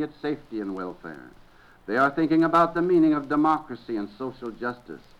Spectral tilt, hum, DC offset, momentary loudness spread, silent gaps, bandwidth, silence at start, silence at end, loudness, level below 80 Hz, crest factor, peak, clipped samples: -7.5 dB/octave; none; under 0.1%; 19 LU; none; 7.4 kHz; 0 s; 0.25 s; -25 LUFS; -56 dBFS; 18 dB; -8 dBFS; under 0.1%